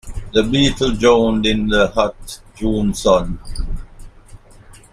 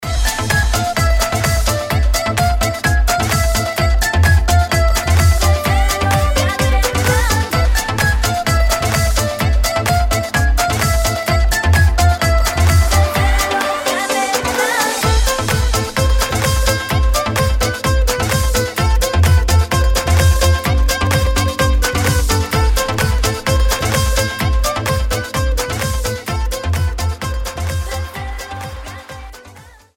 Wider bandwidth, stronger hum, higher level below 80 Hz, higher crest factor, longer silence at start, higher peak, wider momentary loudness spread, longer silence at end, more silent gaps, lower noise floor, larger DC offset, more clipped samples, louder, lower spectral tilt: second, 14.5 kHz vs 17 kHz; neither; second, -28 dBFS vs -18 dBFS; about the same, 18 dB vs 14 dB; about the same, 0.05 s vs 0 s; about the same, 0 dBFS vs 0 dBFS; first, 17 LU vs 7 LU; about the same, 0.15 s vs 0.25 s; neither; about the same, -42 dBFS vs -40 dBFS; neither; neither; about the same, -16 LUFS vs -15 LUFS; about the same, -5 dB/octave vs -4 dB/octave